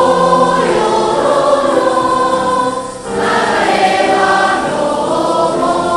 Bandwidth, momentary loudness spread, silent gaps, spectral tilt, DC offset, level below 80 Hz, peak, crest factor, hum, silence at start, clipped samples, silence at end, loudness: 12.5 kHz; 5 LU; none; -4 dB/octave; under 0.1%; -42 dBFS; 0 dBFS; 12 dB; none; 0 s; under 0.1%; 0 s; -12 LUFS